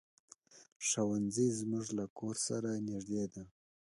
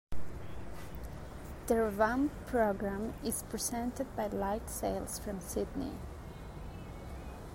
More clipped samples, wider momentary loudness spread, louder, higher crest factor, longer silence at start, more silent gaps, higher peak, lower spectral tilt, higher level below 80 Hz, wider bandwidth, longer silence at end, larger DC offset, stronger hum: neither; second, 8 LU vs 16 LU; about the same, -37 LUFS vs -36 LUFS; about the same, 16 dB vs 20 dB; first, 0.55 s vs 0.1 s; first, 0.72-0.80 s, 2.10-2.16 s vs none; second, -22 dBFS vs -16 dBFS; about the same, -4.5 dB/octave vs -5 dB/octave; second, -72 dBFS vs -48 dBFS; second, 11.5 kHz vs 16 kHz; first, 0.5 s vs 0 s; neither; neither